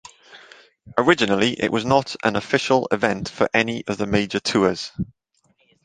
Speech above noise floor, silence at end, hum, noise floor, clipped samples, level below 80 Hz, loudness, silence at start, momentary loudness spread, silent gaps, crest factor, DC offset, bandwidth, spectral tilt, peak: 44 dB; 0.8 s; none; -64 dBFS; under 0.1%; -50 dBFS; -21 LUFS; 0.3 s; 9 LU; none; 22 dB; under 0.1%; 9.8 kHz; -5 dB/octave; 0 dBFS